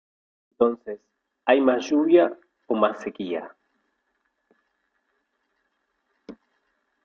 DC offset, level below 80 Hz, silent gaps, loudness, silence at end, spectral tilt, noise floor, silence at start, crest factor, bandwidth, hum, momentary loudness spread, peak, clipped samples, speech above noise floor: under 0.1%; -70 dBFS; none; -23 LUFS; 0.7 s; -5.5 dB/octave; -74 dBFS; 0.6 s; 20 dB; 6.8 kHz; none; 17 LU; -6 dBFS; under 0.1%; 53 dB